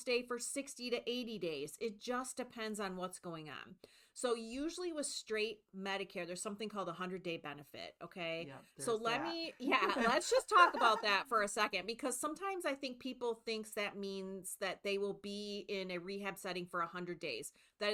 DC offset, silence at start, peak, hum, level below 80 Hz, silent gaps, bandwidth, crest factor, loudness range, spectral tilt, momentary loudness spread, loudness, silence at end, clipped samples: under 0.1%; 0 s; -14 dBFS; none; -74 dBFS; none; 19 kHz; 24 dB; 10 LU; -3 dB/octave; 13 LU; -38 LUFS; 0 s; under 0.1%